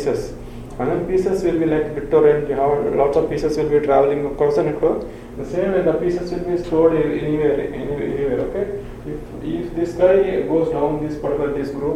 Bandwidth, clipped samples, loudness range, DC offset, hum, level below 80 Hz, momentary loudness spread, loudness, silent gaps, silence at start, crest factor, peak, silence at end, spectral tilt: 11.5 kHz; under 0.1%; 3 LU; under 0.1%; none; -38 dBFS; 11 LU; -19 LUFS; none; 0 s; 16 dB; -2 dBFS; 0 s; -7.5 dB/octave